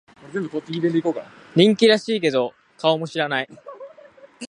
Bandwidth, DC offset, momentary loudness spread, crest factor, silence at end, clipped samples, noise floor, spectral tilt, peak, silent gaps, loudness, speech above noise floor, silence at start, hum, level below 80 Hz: 10.5 kHz; under 0.1%; 17 LU; 20 dB; 0.05 s; under 0.1%; -48 dBFS; -5.5 dB/octave; -2 dBFS; none; -21 LUFS; 27 dB; 0.25 s; none; -70 dBFS